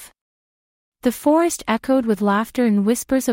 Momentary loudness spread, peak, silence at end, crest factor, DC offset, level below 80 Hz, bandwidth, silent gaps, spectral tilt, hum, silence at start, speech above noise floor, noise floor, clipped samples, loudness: 5 LU; -4 dBFS; 0 s; 14 dB; under 0.1%; -52 dBFS; 16.5 kHz; 0.21-0.92 s; -5 dB/octave; none; 0 s; over 72 dB; under -90 dBFS; under 0.1%; -19 LUFS